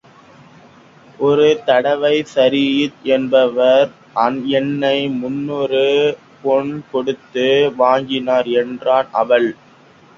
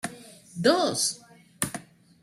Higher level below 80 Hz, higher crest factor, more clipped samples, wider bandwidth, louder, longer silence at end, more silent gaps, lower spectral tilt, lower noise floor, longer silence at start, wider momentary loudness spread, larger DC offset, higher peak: first, -60 dBFS vs -66 dBFS; second, 16 dB vs 24 dB; neither; second, 7.6 kHz vs 16 kHz; first, -16 LUFS vs -26 LUFS; first, 0.65 s vs 0.4 s; neither; first, -5.5 dB/octave vs -3 dB/octave; about the same, -46 dBFS vs -47 dBFS; first, 1.2 s vs 0.05 s; second, 8 LU vs 20 LU; neither; first, 0 dBFS vs -6 dBFS